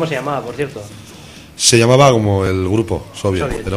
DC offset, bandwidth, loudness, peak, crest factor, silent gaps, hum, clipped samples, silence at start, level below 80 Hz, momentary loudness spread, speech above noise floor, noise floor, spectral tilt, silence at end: under 0.1%; 15.5 kHz; -15 LUFS; 0 dBFS; 16 dB; none; none; under 0.1%; 0 s; -38 dBFS; 22 LU; 22 dB; -37 dBFS; -4.5 dB/octave; 0 s